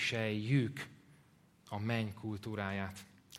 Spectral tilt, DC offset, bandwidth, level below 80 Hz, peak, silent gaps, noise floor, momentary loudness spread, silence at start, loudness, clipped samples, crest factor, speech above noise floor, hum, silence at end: -6 dB/octave; under 0.1%; 15.5 kHz; -72 dBFS; -20 dBFS; none; -66 dBFS; 13 LU; 0 s; -38 LUFS; under 0.1%; 20 dB; 29 dB; none; 0 s